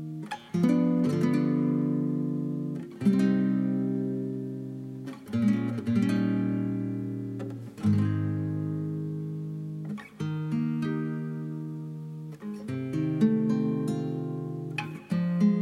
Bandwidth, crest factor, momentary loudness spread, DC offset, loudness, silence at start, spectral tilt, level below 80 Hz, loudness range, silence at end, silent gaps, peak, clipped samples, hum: 11.5 kHz; 16 dB; 12 LU; under 0.1%; -29 LUFS; 0 s; -8.5 dB/octave; -70 dBFS; 6 LU; 0 s; none; -12 dBFS; under 0.1%; none